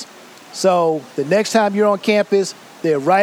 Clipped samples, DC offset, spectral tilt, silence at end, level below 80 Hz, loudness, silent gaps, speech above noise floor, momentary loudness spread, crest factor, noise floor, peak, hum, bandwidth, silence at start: under 0.1%; under 0.1%; -4.5 dB/octave; 0 s; -72 dBFS; -17 LUFS; none; 25 dB; 10 LU; 16 dB; -41 dBFS; -2 dBFS; none; 16 kHz; 0 s